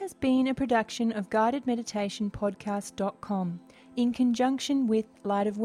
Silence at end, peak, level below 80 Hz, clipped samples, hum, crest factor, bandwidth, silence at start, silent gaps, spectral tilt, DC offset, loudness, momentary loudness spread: 0 s; -14 dBFS; -58 dBFS; under 0.1%; none; 16 dB; 13 kHz; 0 s; none; -5.5 dB/octave; under 0.1%; -29 LUFS; 8 LU